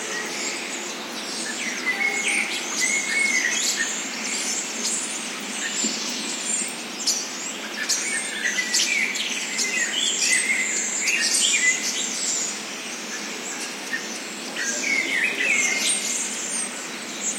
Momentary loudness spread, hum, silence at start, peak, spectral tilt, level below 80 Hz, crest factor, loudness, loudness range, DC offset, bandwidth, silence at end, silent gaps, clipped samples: 10 LU; none; 0 s; -6 dBFS; 0.5 dB/octave; under -90 dBFS; 18 dB; -22 LUFS; 5 LU; under 0.1%; 16.5 kHz; 0 s; none; under 0.1%